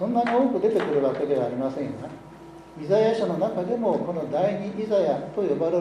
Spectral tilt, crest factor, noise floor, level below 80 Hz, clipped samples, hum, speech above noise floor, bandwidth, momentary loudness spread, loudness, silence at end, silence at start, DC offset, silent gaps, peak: -7.5 dB/octave; 16 dB; -44 dBFS; -60 dBFS; under 0.1%; none; 20 dB; 10.5 kHz; 16 LU; -24 LUFS; 0 s; 0 s; under 0.1%; none; -8 dBFS